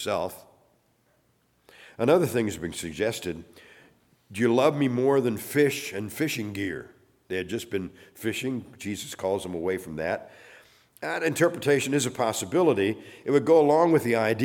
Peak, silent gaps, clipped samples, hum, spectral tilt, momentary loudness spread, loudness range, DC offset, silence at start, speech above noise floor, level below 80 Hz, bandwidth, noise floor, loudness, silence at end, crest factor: -8 dBFS; none; under 0.1%; none; -5 dB/octave; 13 LU; 8 LU; under 0.1%; 0 s; 42 dB; -62 dBFS; 18.5 kHz; -67 dBFS; -26 LUFS; 0 s; 18 dB